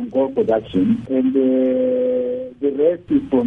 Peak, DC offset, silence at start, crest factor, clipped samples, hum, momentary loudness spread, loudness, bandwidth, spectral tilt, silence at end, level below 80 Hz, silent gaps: -4 dBFS; under 0.1%; 0 s; 12 dB; under 0.1%; none; 5 LU; -19 LUFS; 3.8 kHz; -9.5 dB/octave; 0 s; -52 dBFS; none